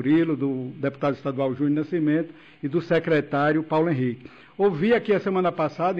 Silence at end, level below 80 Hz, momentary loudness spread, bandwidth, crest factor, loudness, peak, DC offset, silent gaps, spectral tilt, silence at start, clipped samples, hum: 0 s; -62 dBFS; 7 LU; 6.6 kHz; 12 dB; -24 LUFS; -12 dBFS; under 0.1%; none; -9 dB/octave; 0 s; under 0.1%; none